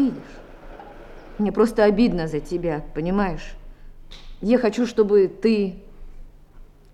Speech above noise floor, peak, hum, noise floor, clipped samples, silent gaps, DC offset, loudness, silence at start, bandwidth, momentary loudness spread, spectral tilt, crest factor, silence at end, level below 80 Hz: 25 dB; -6 dBFS; 50 Hz at -55 dBFS; -45 dBFS; under 0.1%; none; under 0.1%; -21 LUFS; 0 s; 12 kHz; 25 LU; -7 dB/octave; 18 dB; 0.3 s; -40 dBFS